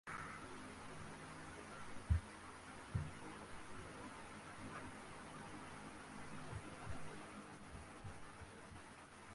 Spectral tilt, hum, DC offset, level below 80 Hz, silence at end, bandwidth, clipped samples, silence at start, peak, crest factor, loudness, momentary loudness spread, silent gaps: -5 dB/octave; none; under 0.1%; -56 dBFS; 0 s; 11.5 kHz; under 0.1%; 0.05 s; -26 dBFS; 24 dB; -51 LUFS; 8 LU; none